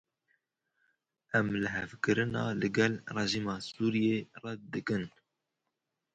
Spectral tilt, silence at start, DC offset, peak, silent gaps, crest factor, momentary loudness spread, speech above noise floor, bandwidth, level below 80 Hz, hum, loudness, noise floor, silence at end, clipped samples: -5.5 dB/octave; 1.35 s; under 0.1%; -12 dBFS; none; 22 dB; 9 LU; 54 dB; 9 kHz; -64 dBFS; none; -32 LUFS; -86 dBFS; 1.05 s; under 0.1%